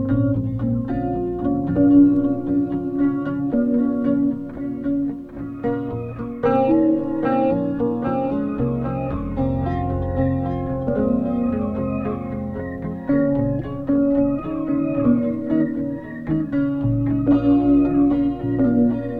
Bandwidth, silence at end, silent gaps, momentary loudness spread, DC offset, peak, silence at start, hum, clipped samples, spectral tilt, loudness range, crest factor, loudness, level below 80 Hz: 4 kHz; 0 s; none; 10 LU; under 0.1%; -4 dBFS; 0 s; none; under 0.1%; -11.5 dB/octave; 4 LU; 16 dB; -21 LUFS; -40 dBFS